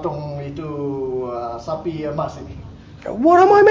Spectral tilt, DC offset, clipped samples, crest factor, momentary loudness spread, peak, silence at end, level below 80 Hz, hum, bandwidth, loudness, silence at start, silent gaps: -7.5 dB/octave; under 0.1%; under 0.1%; 16 dB; 22 LU; -2 dBFS; 0 s; -44 dBFS; none; 7.4 kHz; -19 LUFS; 0 s; none